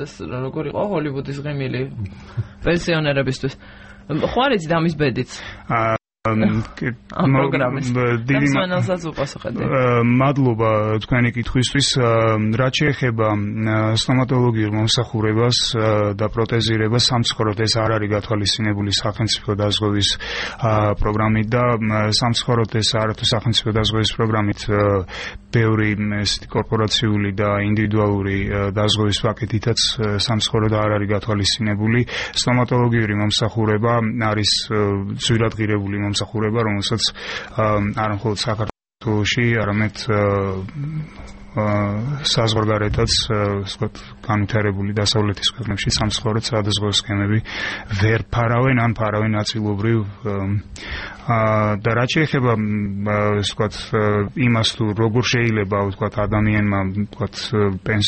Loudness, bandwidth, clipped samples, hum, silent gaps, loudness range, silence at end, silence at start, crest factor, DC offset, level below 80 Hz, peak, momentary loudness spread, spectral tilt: -19 LUFS; 8.8 kHz; under 0.1%; none; none; 3 LU; 0 s; 0 s; 16 dB; under 0.1%; -40 dBFS; -4 dBFS; 8 LU; -5 dB/octave